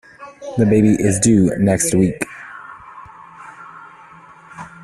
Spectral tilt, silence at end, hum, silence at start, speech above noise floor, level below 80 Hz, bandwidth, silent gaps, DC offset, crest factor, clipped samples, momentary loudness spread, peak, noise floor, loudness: -6 dB/octave; 0.15 s; none; 0.2 s; 29 dB; -46 dBFS; 13 kHz; none; under 0.1%; 16 dB; under 0.1%; 24 LU; -2 dBFS; -42 dBFS; -16 LUFS